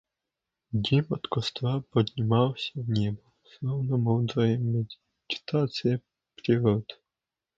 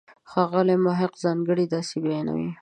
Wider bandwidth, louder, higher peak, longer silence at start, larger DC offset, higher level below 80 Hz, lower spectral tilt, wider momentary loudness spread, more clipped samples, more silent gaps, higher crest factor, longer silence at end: second, 7.6 kHz vs 9.6 kHz; second, -28 LUFS vs -24 LUFS; about the same, -8 dBFS vs -8 dBFS; first, 0.7 s vs 0.3 s; neither; first, -58 dBFS vs -66 dBFS; about the same, -7.5 dB/octave vs -7 dB/octave; first, 10 LU vs 6 LU; neither; neither; about the same, 20 dB vs 16 dB; first, 0.65 s vs 0.05 s